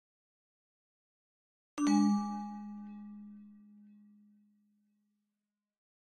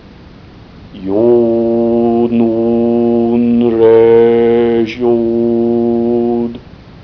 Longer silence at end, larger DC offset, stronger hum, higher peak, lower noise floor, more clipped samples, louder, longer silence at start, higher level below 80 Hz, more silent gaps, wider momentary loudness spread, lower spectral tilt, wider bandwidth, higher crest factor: first, 2.6 s vs 0 s; second, under 0.1% vs 0.1%; neither; second, -18 dBFS vs 0 dBFS; first, -90 dBFS vs -36 dBFS; neither; second, -33 LUFS vs -11 LUFS; first, 1.75 s vs 0.75 s; second, -82 dBFS vs -42 dBFS; neither; first, 23 LU vs 7 LU; second, -5.5 dB/octave vs -9.5 dB/octave; first, 11 kHz vs 5.4 kHz; first, 22 dB vs 12 dB